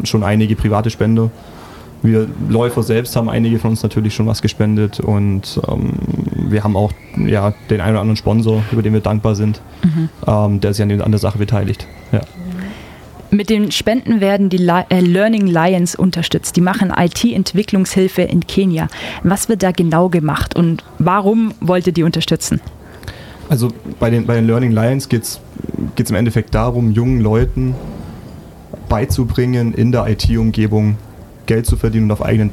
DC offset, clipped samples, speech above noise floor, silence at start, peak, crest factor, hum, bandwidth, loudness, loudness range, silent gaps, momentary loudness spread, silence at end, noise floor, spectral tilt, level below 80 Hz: under 0.1%; under 0.1%; 21 dB; 0 s; -2 dBFS; 12 dB; none; 15.5 kHz; -15 LUFS; 3 LU; none; 9 LU; 0 s; -35 dBFS; -6.5 dB/octave; -32 dBFS